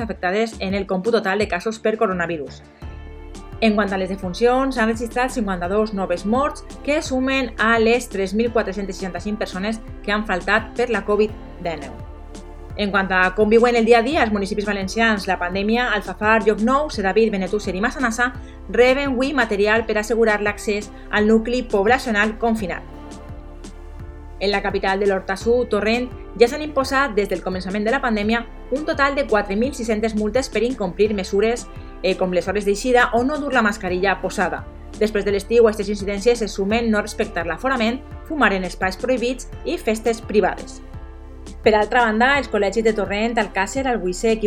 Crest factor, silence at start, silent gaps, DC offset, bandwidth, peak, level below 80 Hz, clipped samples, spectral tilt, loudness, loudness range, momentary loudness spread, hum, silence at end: 20 dB; 0 s; none; under 0.1%; 15 kHz; 0 dBFS; -36 dBFS; under 0.1%; -5 dB/octave; -20 LUFS; 4 LU; 14 LU; none; 0 s